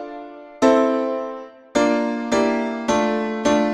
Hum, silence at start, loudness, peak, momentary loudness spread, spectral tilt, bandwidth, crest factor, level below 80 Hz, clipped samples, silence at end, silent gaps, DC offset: none; 0 s; -20 LUFS; -2 dBFS; 16 LU; -4.5 dB/octave; 11 kHz; 18 dB; -54 dBFS; under 0.1%; 0 s; none; under 0.1%